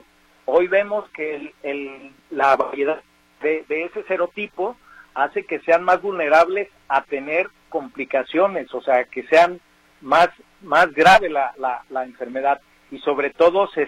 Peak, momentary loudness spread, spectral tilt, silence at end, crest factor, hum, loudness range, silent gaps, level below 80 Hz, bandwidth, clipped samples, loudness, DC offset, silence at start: -2 dBFS; 13 LU; -4.5 dB/octave; 0 s; 18 dB; none; 6 LU; none; -58 dBFS; 12.5 kHz; under 0.1%; -20 LUFS; under 0.1%; 0.5 s